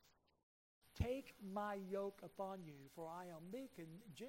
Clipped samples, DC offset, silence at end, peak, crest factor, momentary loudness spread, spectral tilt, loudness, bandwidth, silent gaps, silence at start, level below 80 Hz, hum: under 0.1%; under 0.1%; 0 s; -28 dBFS; 22 dB; 12 LU; -6.5 dB/octave; -50 LUFS; 16 kHz; 0.43-0.81 s; 0.05 s; -62 dBFS; none